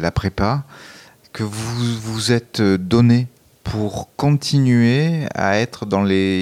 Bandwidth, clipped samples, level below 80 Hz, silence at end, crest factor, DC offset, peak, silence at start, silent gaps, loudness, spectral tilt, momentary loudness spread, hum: 14.5 kHz; under 0.1%; -42 dBFS; 0 s; 14 dB; under 0.1%; -4 dBFS; 0 s; none; -18 LUFS; -6 dB/octave; 12 LU; none